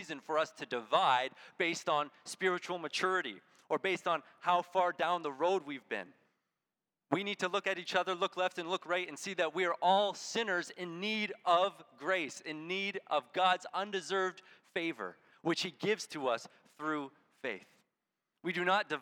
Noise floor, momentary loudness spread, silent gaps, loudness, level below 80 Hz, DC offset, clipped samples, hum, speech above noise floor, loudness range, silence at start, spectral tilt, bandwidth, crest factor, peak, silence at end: under -90 dBFS; 11 LU; none; -35 LUFS; under -90 dBFS; under 0.1%; under 0.1%; none; over 55 dB; 4 LU; 0 s; -3.5 dB/octave; 18 kHz; 22 dB; -14 dBFS; 0 s